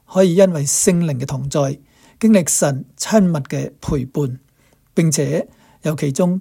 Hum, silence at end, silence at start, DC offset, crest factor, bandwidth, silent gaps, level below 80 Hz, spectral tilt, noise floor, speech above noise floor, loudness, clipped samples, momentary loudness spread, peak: none; 0 s; 0.1 s; under 0.1%; 16 dB; 16.5 kHz; none; -44 dBFS; -5.5 dB/octave; -56 dBFS; 40 dB; -17 LUFS; under 0.1%; 11 LU; 0 dBFS